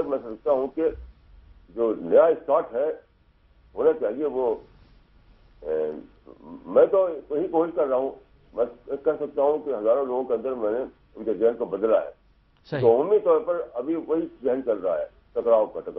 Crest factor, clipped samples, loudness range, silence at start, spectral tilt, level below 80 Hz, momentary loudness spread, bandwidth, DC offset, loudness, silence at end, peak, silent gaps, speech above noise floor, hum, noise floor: 18 dB; under 0.1%; 4 LU; 0 s; -10 dB/octave; -56 dBFS; 13 LU; 4.8 kHz; under 0.1%; -24 LUFS; 0 s; -6 dBFS; none; 36 dB; none; -59 dBFS